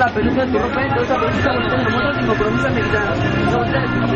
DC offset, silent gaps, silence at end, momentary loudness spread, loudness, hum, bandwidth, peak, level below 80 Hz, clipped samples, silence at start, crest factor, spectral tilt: under 0.1%; none; 0 s; 1 LU; -17 LUFS; none; 8.8 kHz; -6 dBFS; -34 dBFS; under 0.1%; 0 s; 12 dB; -7 dB/octave